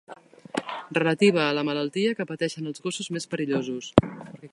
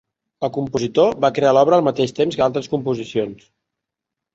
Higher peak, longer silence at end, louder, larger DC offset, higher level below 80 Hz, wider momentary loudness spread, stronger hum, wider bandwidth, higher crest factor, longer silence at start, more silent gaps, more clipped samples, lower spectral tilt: about the same, 0 dBFS vs -2 dBFS; second, 0.05 s vs 1 s; second, -26 LUFS vs -18 LUFS; neither; about the same, -52 dBFS vs -56 dBFS; about the same, 12 LU vs 10 LU; neither; first, 11.5 kHz vs 8 kHz; first, 26 dB vs 18 dB; second, 0.1 s vs 0.4 s; neither; neither; about the same, -5.5 dB/octave vs -6 dB/octave